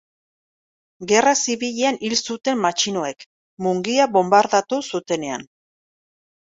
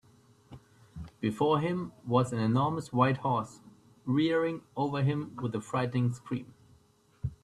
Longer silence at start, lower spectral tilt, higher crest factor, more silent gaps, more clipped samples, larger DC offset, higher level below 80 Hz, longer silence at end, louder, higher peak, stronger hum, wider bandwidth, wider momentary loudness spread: first, 1 s vs 0.5 s; second, -3 dB/octave vs -7.5 dB/octave; about the same, 20 dB vs 20 dB; first, 3.26-3.57 s vs none; neither; neither; second, -66 dBFS vs -60 dBFS; first, 1.05 s vs 0.1 s; first, -20 LUFS vs -31 LUFS; first, -2 dBFS vs -10 dBFS; neither; second, 8 kHz vs 11.5 kHz; about the same, 12 LU vs 13 LU